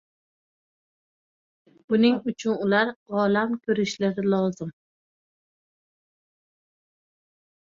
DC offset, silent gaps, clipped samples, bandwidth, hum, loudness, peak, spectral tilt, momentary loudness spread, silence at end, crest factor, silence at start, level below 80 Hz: under 0.1%; 2.96-3.06 s; under 0.1%; 7.6 kHz; none; -24 LUFS; -8 dBFS; -6 dB/octave; 6 LU; 3.05 s; 20 dB; 1.9 s; -70 dBFS